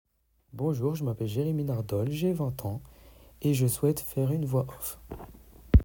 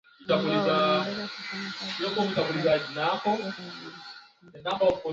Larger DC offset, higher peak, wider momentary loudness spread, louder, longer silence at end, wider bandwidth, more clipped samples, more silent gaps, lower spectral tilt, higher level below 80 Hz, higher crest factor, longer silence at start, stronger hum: neither; first, -6 dBFS vs -12 dBFS; about the same, 15 LU vs 16 LU; second, -30 LUFS vs -27 LUFS; about the same, 0 s vs 0 s; first, 18 kHz vs 7.8 kHz; neither; neither; first, -7 dB/octave vs -5.5 dB/octave; first, -36 dBFS vs -64 dBFS; first, 22 dB vs 16 dB; first, 0.55 s vs 0.2 s; neither